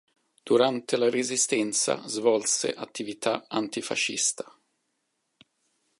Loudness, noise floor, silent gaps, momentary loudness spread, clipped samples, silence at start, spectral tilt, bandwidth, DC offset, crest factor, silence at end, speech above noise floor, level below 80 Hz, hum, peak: -26 LUFS; -77 dBFS; none; 8 LU; under 0.1%; 0.45 s; -2 dB/octave; 11.5 kHz; under 0.1%; 20 dB; 1.5 s; 51 dB; -80 dBFS; none; -8 dBFS